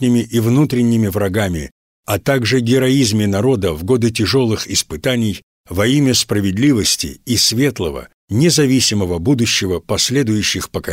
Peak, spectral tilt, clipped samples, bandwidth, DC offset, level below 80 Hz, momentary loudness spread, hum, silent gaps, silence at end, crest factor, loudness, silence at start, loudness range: -4 dBFS; -4.5 dB/octave; under 0.1%; 16.5 kHz; under 0.1%; -40 dBFS; 9 LU; none; 1.71-2.03 s, 5.43-5.64 s, 8.14-8.28 s; 0 s; 12 dB; -15 LUFS; 0 s; 1 LU